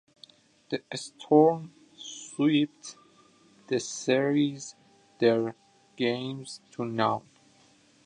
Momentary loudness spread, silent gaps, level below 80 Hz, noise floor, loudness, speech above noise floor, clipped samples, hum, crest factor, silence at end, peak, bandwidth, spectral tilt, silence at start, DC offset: 18 LU; none; -76 dBFS; -61 dBFS; -28 LUFS; 34 dB; under 0.1%; none; 22 dB; 0.85 s; -8 dBFS; 10.5 kHz; -5 dB/octave; 0.7 s; under 0.1%